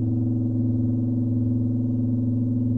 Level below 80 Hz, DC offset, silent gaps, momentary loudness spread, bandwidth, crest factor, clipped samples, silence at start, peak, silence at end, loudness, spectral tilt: -48 dBFS; 0.6%; none; 1 LU; 1.2 kHz; 10 dB; under 0.1%; 0 s; -14 dBFS; 0 s; -24 LUFS; -13.5 dB/octave